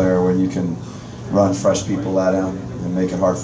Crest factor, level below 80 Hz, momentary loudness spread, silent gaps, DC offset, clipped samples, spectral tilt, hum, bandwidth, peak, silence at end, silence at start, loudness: 16 dB; -42 dBFS; 10 LU; none; under 0.1%; under 0.1%; -6.5 dB/octave; none; 8 kHz; -2 dBFS; 0 s; 0 s; -19 LUFS